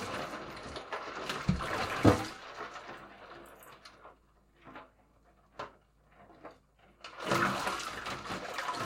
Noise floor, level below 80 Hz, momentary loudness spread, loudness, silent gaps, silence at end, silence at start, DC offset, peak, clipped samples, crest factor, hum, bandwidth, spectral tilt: -65 dBFS; -54 dBFS; 24 LU; -34 LUFS; none; 0 s; 0 s; under 0.1%; -6 dBFS; under 0.1%; 32 dB; none; 16.5 kHz; -5 dB/octave